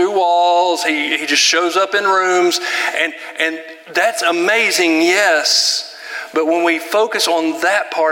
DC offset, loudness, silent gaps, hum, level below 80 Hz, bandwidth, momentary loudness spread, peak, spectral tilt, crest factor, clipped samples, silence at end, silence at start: under 0.1%; -14 LUFS; none; none; -78 dBFS; 17 kHz; 7 LU; 0 dBFS; -0.5 dB/octave; 16 dB; under 0.1%; 0 s; 0 s